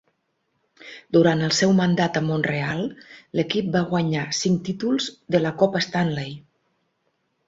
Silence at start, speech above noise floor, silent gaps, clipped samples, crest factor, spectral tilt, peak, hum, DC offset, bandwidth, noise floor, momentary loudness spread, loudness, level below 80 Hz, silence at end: 0.8 s; 50 dB; none; under 0.1%; 18 dB; -5.5 dB/octave; -4 dBFS; none; under 0.1%; 8 kHz; -72 dBFS; 11 LU; -22 LUFS; -60 dBFS; 1.1 s